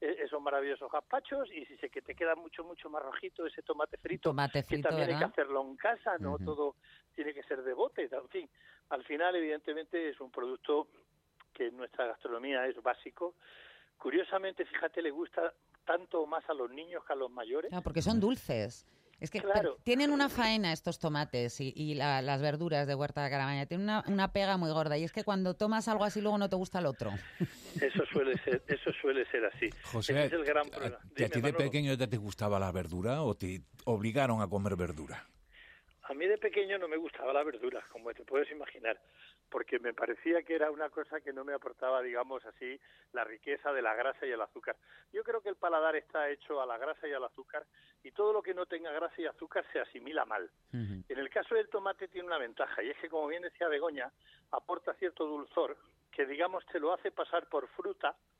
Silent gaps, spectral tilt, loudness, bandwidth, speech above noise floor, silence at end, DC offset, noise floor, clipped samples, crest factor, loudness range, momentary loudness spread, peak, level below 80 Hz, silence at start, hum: none; -6 dB/octave; -35 LUFS; 15 kHz; 33 dB; 0.3 s; under 0.1%; -68 dBFS; under 0.1%; 20 dB; 5 LU; 10 LU; -16 dBFS; -64 dBFS; 0 s; none